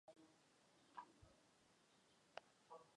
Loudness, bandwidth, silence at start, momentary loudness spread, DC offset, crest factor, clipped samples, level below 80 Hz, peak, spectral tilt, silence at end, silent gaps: -64 LUFS; 10.5 kHz; 0.05 s; 5 LU; under 0.1%; 34 dB; under 0.1%; -88 dBFS; -34 dBFS; -3.5 dB/octave; 0 s; none